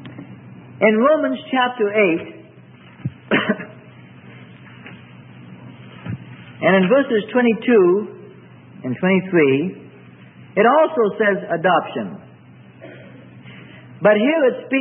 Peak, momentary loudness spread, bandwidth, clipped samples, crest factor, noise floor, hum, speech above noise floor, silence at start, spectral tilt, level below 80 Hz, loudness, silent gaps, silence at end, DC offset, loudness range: -2 dBFS; 25 LU; 3.8 kHz; under 0.1%; 18 dB; -44 dBFS; none; 28 dB; 0 s; -11.5 dB/octave; -66 dBFS; -17 LUFS; none; 0 s; under 0.1%; 9 LU